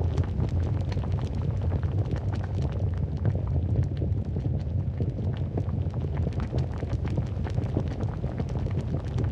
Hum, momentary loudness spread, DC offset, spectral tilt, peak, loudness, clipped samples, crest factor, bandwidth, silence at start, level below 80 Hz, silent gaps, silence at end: none; 3 LU; under 0.1%; -9 dB/octave; -12 dBFS; -29 LUFS; under 0.1%; 14 dB; 7.2 kHz; 0 s; -36 dBFS; none; 0 s